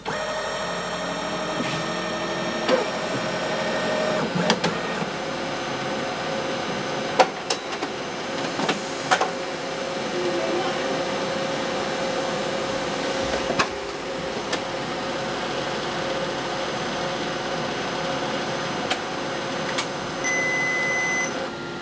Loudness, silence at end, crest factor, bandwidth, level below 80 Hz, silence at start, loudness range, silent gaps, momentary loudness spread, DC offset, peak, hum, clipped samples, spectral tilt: -25 LUFS; 0 s; 26 dB; 8 kHz; -54 dBFS; 0 s; 2 LU; none; 6 LU; under 0.1%; 0 dBFS; none; under 0.1%; -3.5 dB/octave